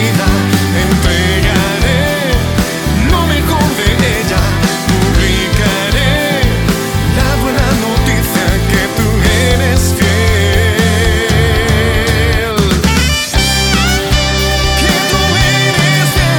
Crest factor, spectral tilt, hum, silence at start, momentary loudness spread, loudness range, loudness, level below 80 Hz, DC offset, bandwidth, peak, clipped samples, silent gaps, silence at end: 10 dB; -4.5 dB/octave; none; 0 s; 3 LU; 2 LU; -11 LUFS; -18 dBFS; under 0.1%; 19.5 kHz; 0 dBFS; under 0.1%; none; 0 s